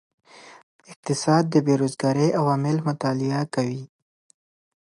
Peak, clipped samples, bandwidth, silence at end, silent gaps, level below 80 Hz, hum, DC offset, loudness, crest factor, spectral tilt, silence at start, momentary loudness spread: -6 dBFS; under 0.1%; 11.5 kHz; 0.95 s; 0.63-0.79 s, 0.96-1.03 s; -68 dBFS; none; under 0.1%; -23 LUFS; 18 dB; -6.5 dB/octave; 0.35 s; 9 LU